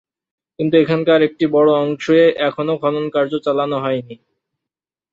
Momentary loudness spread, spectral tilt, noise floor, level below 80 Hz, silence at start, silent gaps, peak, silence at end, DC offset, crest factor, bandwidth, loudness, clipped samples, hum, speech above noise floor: 7 LU; -7 dB/octave; -86 dBFS; -64 dBFS; 0.6 s; none; -2 dBFS; 1 s; under 0.1%; 16 dB; 7.4 kHz; -16 LUFS; under 0.1%; none; 71 dB